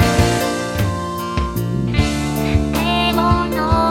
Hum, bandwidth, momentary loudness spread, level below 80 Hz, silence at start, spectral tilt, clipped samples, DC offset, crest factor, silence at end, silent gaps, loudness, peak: none; 18 kHz; 6 LU; -26 dBFS; 0 s; -5.5 dB/octave; under 0.1%; under 0.1%; 16 dB; 0 s; none; -18 LUFS; 0 dBFS